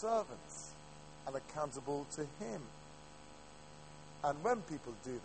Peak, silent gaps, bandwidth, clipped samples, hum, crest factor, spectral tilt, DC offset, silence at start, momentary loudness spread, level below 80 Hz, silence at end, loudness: -22 dBFS; none; 8.4 kHz; under 0.1%; 50 Hz at -60 dBFS; 20 dB; -4.5 dB/octave; under 0.1%; 0 s; 19 LU; -66 dBFS; 0 s; -42 LUFS